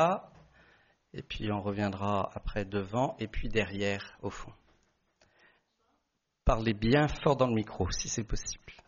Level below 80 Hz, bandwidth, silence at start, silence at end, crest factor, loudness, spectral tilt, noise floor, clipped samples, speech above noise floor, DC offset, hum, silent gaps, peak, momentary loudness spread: -44 dBFS; 7.2 kHz; 0 s; 0.15 s; 20 dB; -32 LUFS; -5 dB/octave; -80 dBFS; under 0.1%; 49 dB; under 0.1%; none; none; -12 dBFS; 14 LU